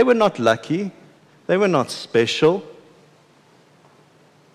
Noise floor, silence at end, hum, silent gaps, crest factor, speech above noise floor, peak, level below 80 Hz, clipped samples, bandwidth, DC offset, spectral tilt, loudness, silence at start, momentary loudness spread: -54 dBFS; 1.8 s; none; none; 16 dB; 35 dB; -6 dBFS; -66 dBFS; under 0.1%; 13 kHz; under 0.1%; -5.5 dB/octave; -20 LUFS; 0 s; 10 LU